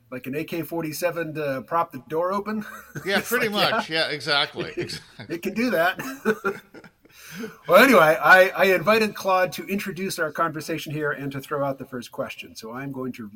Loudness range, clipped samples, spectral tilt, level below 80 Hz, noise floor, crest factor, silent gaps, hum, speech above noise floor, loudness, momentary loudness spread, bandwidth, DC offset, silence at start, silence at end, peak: 9 LU; under 0.1%; -4 dB/octave; -62 dBFS; -48 dBFS; 20 dB; none; none; 25 dB; -22 LUFS; 19 LU; 17 kHz; under 0.1%; 0.1 s; 0.05 s; -4 dBFS